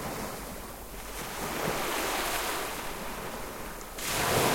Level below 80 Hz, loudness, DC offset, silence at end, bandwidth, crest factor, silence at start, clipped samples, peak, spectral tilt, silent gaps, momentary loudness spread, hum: -48 dBFS; -33 LUFS; under 0.1%; 0 s; 16.5 kHz; 20 dB; 0 s; under 0.1%; -14 dBFS; -2.5 dB/octave; none; 11 LU; none